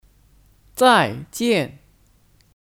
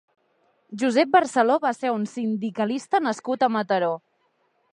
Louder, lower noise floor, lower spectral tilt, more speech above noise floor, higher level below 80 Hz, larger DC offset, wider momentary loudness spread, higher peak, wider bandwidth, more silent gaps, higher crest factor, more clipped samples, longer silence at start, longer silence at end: first, -18 LUFS vs -23 LUFS; second, -57 dBFS vs -68 dBFS; about the same, -4 dB/octave vs -5 dB/octave; second, 39 dB vs 46 dB; first, -56 dBFS vs -78 dBFS; neither; first, 15 LU vs 8 LU; first, 0 dBFS vs -4 dBFS; first, 17.5 kHz vs 10.5 kHz; neither; about the same, 22 dB vs 20 dB; neither; about the same, 0.75 s vs 0.7 s; first, 0.9 s vs 0.75 s